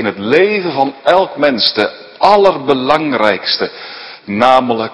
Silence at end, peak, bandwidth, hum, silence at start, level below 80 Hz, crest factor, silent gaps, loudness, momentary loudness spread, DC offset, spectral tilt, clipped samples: 0 s; 0 dBFS; 11 kHz; none; 0 s; -52 dBFS; 12 dB; none; -12 LUFS; 10 LU; under 0.1%; -5.5 dB/octave; 0.6%